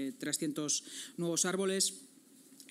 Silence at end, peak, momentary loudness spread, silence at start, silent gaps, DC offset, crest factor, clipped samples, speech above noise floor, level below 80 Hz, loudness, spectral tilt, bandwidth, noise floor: 0 s; -18 dBFS; 8 LU; 0 s; none; under 0.1%; 20 dB; under 0.1%; 25 dB; under -90 dBFS; -34 LUFS; -2.5 dB/octave; 16 kHz; -60 dBFS